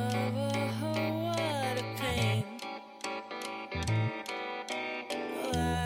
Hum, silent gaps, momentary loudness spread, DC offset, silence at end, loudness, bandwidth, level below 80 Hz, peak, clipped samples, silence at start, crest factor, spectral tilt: none; none; 8 LU; under 0.1%; 0 s; -34 LUFS; 16.5 kHz; -52 dBFS; -18 dBFS; under 0.1%; 0 s; 16 dB; -5.5 dB/octave